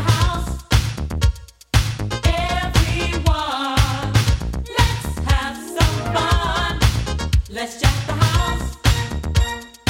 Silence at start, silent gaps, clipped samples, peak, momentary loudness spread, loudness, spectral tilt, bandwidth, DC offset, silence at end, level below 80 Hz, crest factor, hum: 0 s; none; under 0.1%; -2 dBFS; 5 LU; -20 LUFS; -4.5 dB/octave; 16.5 kHz; under 0.1%; 0 s; -24 dBFS; 16 dB; none